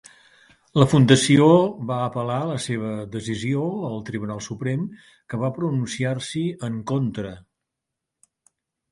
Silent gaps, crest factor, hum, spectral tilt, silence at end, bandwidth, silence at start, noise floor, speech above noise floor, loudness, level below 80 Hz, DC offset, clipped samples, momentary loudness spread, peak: none; 22 dB; none; -6 dB/octave; 1.5 s; 11.5 kHz; 0.75 s; -84 dBFS; 62 dB; -22 LUFS; -56 dBFS; under 0.1%; under 0.1%; 15 LU; 0 dBFS